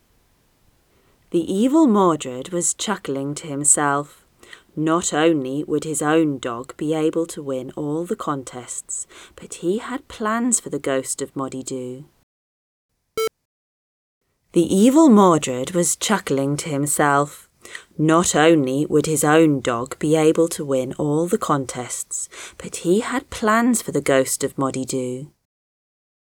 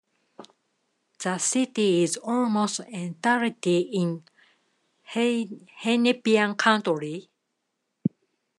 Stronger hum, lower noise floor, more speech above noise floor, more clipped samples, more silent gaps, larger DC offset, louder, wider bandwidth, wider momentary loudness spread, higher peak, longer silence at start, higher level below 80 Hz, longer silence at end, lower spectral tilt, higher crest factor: neither; second, -61 dBFS vs -79 dBFS; second, 41 dB vs 54 dB; neither; first, 12.23-12.89 s, 13.45-14.21 s vs none; neither; first, -20 LUFS vs -25 LUFS; first, 19.5 kHz vs 12 kHz; first, 14 LU vs 11 LU; first, -2 dBFS vs -6 dBFS; first, 1.3 s vs 0.4 s; first, -56 dBFS vs -82 dBFS; first, 1.05 s vs 0.5 s; about the same, -4.5 dB/octave vs -4 dB/octave; about the same, 20 dB vs 22 dB